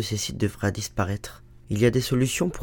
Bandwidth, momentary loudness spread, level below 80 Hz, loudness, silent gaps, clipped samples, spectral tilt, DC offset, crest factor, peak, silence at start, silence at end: 19 kHz; 10 LU; -46 dBFS; -25 LUFS; none; under 0.1%; -5 dB/octave; under 0.1%; 18 dB; -6 dBFS; 0 s; 0 s